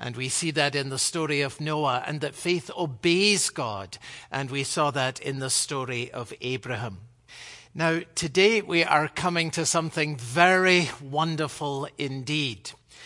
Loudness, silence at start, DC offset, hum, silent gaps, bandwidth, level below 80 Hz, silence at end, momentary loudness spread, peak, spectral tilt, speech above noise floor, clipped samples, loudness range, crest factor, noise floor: -25 LUFS; 0 s; under 0.1%; none; none; 11.5 kHz; -64 dBFS; 0 s; 13 LU; -4 dBFS; -3.5 dB/octave; 20 dB; under 0.1%; 6 LU; 22 dB; -46 dBFS